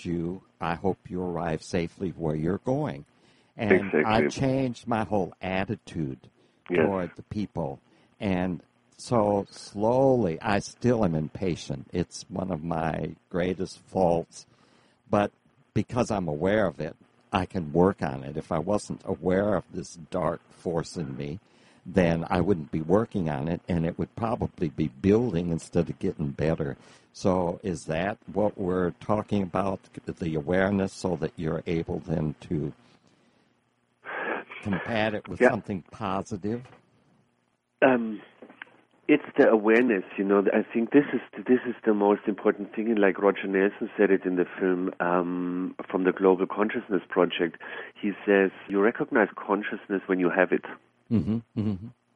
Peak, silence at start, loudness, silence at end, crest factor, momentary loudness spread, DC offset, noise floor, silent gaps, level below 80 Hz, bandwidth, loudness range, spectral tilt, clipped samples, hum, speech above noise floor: -6 dBFS; 0 s; -27 LUFS; 0.25 s; 22 dB; 11 LU; under 0.1%; -72 dBFS; none; -54 dBFS; 11 kHz; 6 LU; -7 dB/octave; under 0.1%; none; 46 dB